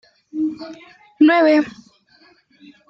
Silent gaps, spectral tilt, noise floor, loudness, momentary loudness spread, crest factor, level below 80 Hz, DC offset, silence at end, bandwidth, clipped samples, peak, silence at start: none; -5.5 dB/octave; -54 dBFS; -17 LUFS; 21 LU; 16 dB; -70 dBFS; under 0.1%; 1.2 s; 6.2 kHz; under 0.1%; -4 dBFS; 0.35 s